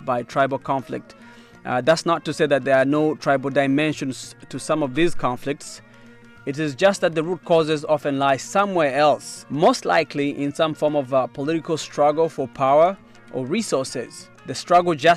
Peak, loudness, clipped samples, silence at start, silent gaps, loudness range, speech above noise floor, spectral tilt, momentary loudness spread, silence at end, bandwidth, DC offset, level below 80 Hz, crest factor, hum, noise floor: -6 dBFS; -21 LUFS; under 0.1%; 0 s; none; 4 LU; 25 dB; -5 dB/octave; 14 LU; 0 s; 13.5 kHz; under 0.1%; -52 dBFS; 16 dB; none; -46 dBFS